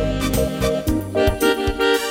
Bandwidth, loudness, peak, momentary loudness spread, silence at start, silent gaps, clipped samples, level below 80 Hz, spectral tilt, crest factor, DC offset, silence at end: 17 kHz; -20 LUFS; -4 dBFS; 4 LU; 0 s; none; under 0.1%; -28 dBFS; -5 dB/octave; 16 dB; under 0.1%; 0 s